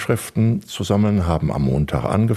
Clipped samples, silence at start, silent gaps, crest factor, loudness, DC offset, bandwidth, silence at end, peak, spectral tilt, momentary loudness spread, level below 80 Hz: under 0.1%; 0 s; none; 16 dB; -20 LUFS; under 0.1%; 14 kHz; 0 s; -4 dBFS; -7 dB/octave; 4 LU; -34 dBFS